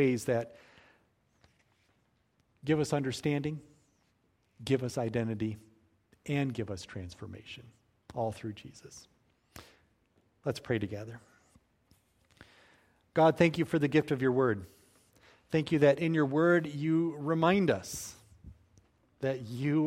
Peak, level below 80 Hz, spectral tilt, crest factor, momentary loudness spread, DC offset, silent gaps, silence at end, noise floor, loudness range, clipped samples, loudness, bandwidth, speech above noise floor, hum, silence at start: -10 dBFS; -64 dBFS; -6.5 dB/octave; 22 dB; 20 LU; under 0.1%; none; 0 s; -73 dBFS; 12 LU; under 0.1%; -31 LUFS; 16 kHz; 43 dB; none; 0 s